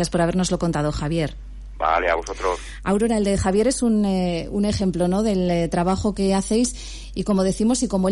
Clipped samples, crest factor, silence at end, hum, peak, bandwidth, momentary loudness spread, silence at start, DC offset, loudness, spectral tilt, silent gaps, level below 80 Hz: under 0.1%; 12 dB; 0 s; none; -10 dBFS; 11.5 kHz; 6 LU; 0 s; under 0.1%; -21 LUFS; -5.5 dB/octave; none; -36 dBFS